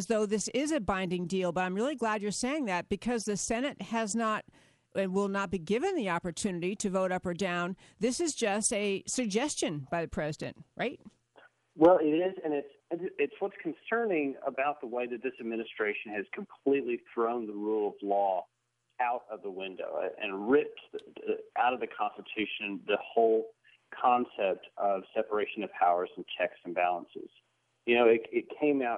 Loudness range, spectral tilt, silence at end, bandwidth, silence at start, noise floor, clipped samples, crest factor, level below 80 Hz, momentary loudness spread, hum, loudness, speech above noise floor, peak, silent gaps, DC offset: 3 LU; -4.5 dB/octave; 0 s; 11.5 kHz; 0 s; -62 dBFS; under 0.1%; 20 dB; -62 dBFS; 10 LU; none; -31 LUFS; 31 dB; -10 dBFS; none; under 0.1%